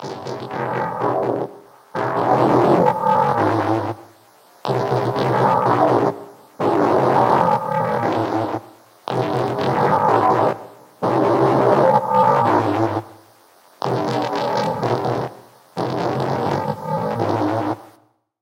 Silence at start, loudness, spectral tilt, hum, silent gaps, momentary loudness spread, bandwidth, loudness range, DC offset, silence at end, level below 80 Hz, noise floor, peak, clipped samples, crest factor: 0 s; -19 LUFS; -7 dB/octave; none; none; 12 LU; 16.5 kHz; 6 LU; under 0.1%; 0.55 s; -58 dBFS; -56 dBFS; 0 dBFS; under 0.1%; 18 dB